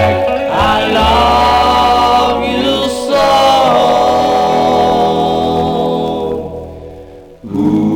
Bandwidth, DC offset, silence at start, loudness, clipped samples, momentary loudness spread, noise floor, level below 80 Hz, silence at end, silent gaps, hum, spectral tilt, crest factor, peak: 18.5 kHz; 0.2%; 0 s; -11 LUFS; under 0.1%; 10 LU; -34 dBFS; -30 dBFS; 0 s; none; none; -5 dB/octave; 10 dB; 0 dBFS